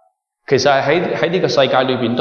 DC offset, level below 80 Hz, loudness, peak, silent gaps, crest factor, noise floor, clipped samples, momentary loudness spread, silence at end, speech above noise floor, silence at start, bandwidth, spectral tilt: under 0.1%; -60 dBFS; -15 LUFS; 0 dBFS; none; 14 dB; -41 dBFS; under 0.1%; 4 LU; 0 s; 26 dB; 0.5 s; 7.2 kHz; -5 dB/octave